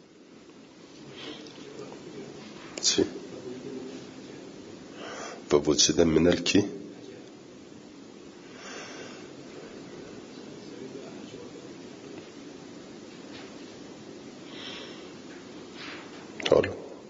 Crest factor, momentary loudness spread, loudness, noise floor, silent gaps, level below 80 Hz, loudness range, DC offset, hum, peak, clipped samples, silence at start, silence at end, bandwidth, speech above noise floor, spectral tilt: 26 dB; 23 LU; -28 LUFS; -52 dBFS; none; -60 dBFS; 17 LU; under 0.1%; none; -6 dBFS; under 0.1%; 0 s; 0 s; 7.8 kHz; 28 dB; -3.5 dB/octave